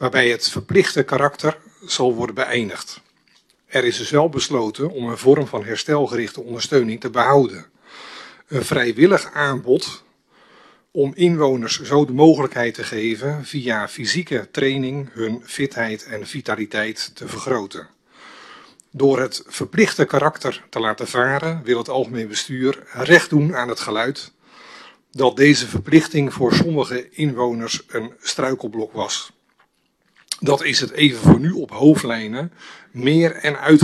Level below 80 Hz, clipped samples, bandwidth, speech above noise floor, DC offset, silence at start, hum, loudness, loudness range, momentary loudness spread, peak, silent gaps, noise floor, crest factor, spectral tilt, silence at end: -54 dBFS; under 0.1%; 13 kHz; 47 dB; under 0.1%; 0 s; none; -19 LUFS; 6 LU; 14 LU; 0 dBFS; none; -65 dBFS; 20 dB; -5 dB/octave; 0 s